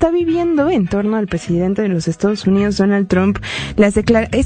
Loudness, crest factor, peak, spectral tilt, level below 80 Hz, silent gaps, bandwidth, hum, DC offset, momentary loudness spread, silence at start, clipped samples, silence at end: -16 LUFS; 14 dB; 0 dBFS; -6.5 dB/octave; -36 dBFS; none; 9.4 kHz; none; under 0.1%; 4 LU; 0 s; under 0.1%; 0 s